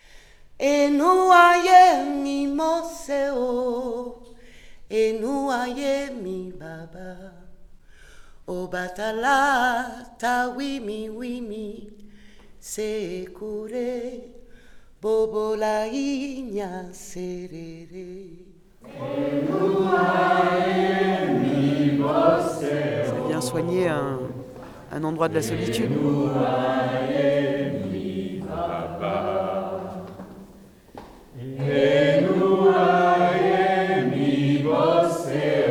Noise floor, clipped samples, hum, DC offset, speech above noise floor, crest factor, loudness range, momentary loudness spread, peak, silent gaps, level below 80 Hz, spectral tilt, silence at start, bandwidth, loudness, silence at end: -48 dBFS; under 0.1%; none; under 0.1%; 26 dB; 20 dB; 12 LU; 18 LU; -2 dBFS; none; -52 dBFS; -6 dB/octave; 0.15 s; 17.5 kHz; -22 LUFS; 0 s